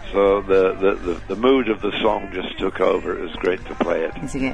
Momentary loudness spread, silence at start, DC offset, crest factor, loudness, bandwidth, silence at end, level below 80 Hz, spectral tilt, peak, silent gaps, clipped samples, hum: 9 LU; 0 s; 1%; 14 dB; -21 LUFS; 10.5 kHz; 0 s; -38 dBFS; -6 dB/octave; -6 dBFS; none; under 0.1%; none